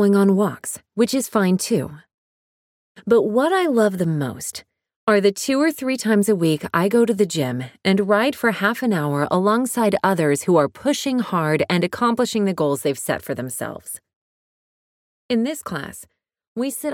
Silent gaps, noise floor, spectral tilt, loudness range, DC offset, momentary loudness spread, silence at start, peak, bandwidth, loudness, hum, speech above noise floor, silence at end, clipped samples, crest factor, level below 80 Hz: 2.14-2.95 s, 4.96-5.07 s, 14.16-15.29 s, 16.48-16.56 s; under -90 dBFS; -5 dB/octave; 7 LU; under 0.1%; 12 LU; 0 s; -4 dBFS; 17.5 kHz; -20 LUFS; none; over 71 dB; 0 s; under 0.1%; 16 dB; -62 dBFS